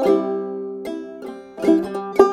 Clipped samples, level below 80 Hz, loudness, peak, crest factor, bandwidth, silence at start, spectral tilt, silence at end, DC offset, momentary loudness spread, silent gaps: under 0.1%; -58 dBFS; -22 LUFS; 0 dBFS; 20 dB; 13 kHz; 0 s; -6.5 dB/octave; 0 s; under 0.1%; 15 LU; none